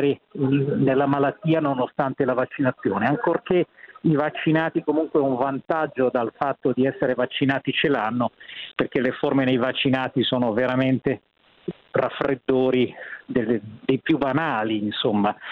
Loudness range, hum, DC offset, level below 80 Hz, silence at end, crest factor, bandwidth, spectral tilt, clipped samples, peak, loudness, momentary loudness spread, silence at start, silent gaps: 1 LU; none; under 0.1%; -60 dBFS; 0 s; 16 dB; 5 kHz; -9 dB/octave; under 0.1%; -6 dBFS; -23 LUFS; 6 LU; 0 s; none